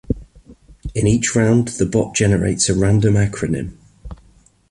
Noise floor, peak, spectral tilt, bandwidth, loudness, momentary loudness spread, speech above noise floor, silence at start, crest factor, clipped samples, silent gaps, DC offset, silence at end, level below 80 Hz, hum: -52 dBFS; -2 dBFS; -5.5 dB/octave; 11.5 kHz; -17 LUFS; 12 LU; 36 dB; 0.1 s; 16 dB; under 0.1%; none; under 0.1%; 0.55 s; -36 dBFS; none